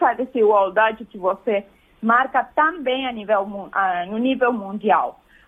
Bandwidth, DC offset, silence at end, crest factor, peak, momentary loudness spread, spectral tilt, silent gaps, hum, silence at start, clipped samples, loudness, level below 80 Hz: 3.8 kHz; under 0.1%; 0.35 s; 16 dB; -4 dBFS; 8 LU; -7 dB/octave; none; none; 0 s; under 0.1%; -20 LUFS; -60 dBFS